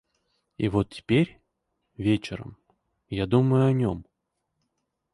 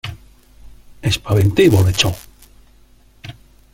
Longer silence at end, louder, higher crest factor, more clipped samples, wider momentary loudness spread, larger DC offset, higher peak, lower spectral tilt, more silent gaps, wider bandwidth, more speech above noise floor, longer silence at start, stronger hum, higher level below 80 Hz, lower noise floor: first, 1.1 s vs 0.4 s; second, -25 LUFS vs -15 LUFS; about the same, 18 dB vs 18 dB; neither; second, 15 LU vs 25 LU; neither; second, -8 dBFS vs -2 dBFS; first, -8 dB/octave vs -5.5 dB/octave; neither; second, 11 kHz vs 16.5 kHz; first, 56 dB vs 35 dB; first, 0.6 s vs 0.05 s; neither; second, -52 dBFS vs -40 dBFS; first, -80 dBFS vs -49 dBFS